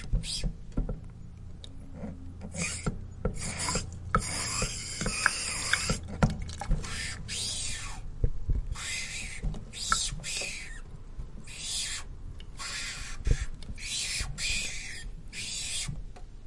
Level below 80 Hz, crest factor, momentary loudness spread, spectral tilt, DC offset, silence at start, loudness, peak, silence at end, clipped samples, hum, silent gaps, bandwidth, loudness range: -38 dBFS; 28 dB; 16 LU; -2.5 dB/octave; under 0.1%; 0 s; -33 LUFS; -6 dBFS; 0 s; under 0.1%; none; none; 11.5 kHz; 6 LU